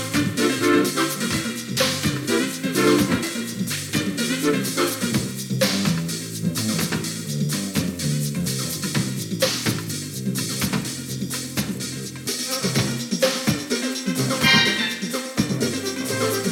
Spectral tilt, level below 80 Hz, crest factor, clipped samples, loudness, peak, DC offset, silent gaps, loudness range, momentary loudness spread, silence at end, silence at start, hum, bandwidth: -3.5 dB/octave; -54 dBFS; 18 dB; under 0.1%; -22 LUFS; -4 dBFS; under 0.1%; none; 4 LU; 8 LU; 0 s; 0 s; none; 18 kHz